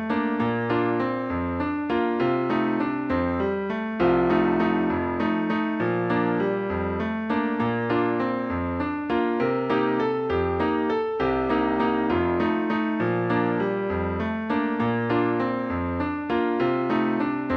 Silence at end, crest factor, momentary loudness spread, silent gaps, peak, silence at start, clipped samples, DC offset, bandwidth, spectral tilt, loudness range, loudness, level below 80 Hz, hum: 0 s; 16 dB; 4 LU; none; -8 dBFS; 0 s; under 0.1%; under 0.1%; 6.2 kHz; -9 dB/octave; 2 LU; -24 LUFS; -48 dBFS; none